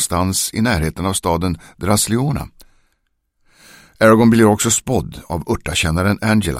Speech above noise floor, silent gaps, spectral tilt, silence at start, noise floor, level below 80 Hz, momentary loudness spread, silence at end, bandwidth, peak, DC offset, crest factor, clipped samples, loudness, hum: 51 dB; none; -4.5 dB/octave; 0 s; -67 dBFS; -36 dBFS; 12 LU; 0 s; 16 kHz; 0 dBFS; under 0.1%; 16 dB; under 0.1%; -16 LUFS; none